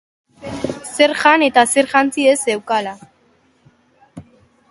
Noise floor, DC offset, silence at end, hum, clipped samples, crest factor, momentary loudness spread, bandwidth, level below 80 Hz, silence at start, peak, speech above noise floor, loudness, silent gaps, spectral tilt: -57 dBFS; under 0.1%; 0.5 s; none; under 0.1%; 18 dB; 15 LU; 12 kHz; -56 dBFS; 0.4 s; 0 dBFS; 42 dB; -15 LUFS; none; -2.5 dB/octave